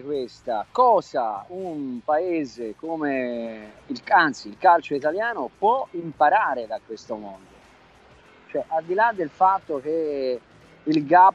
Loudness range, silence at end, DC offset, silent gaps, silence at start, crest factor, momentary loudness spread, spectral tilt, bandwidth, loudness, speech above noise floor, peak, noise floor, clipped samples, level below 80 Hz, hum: 5 LU; 0 s; under 0.1%; none; 0 s; 20 dB; 15 LU; -5.5 dB/octave; 8.2 kHz; -23 LUFS; 30 dB; -4 dBFS; -52 dBFS; under 0.1%; -64 dBFS; none